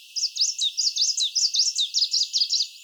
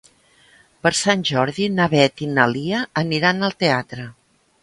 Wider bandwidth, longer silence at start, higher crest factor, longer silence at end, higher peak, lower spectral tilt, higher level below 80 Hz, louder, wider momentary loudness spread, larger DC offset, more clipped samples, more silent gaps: first, over 20 kHz vs 11.5 kHz; second, 0 s vs 0.85 s; second, 14 dB vs 20 dB; second, 0 s vs 0.5 s; second, -10 dBFS vs 0 dBFS; second, 14.5 dB/octave vs -4.5 dB/octave; second, under -90 dBFS vs -58 dBFS; about the same, -21 LUFS vs -19 LUFS; second, 2 LU vs 6 LU; neither; neither; neither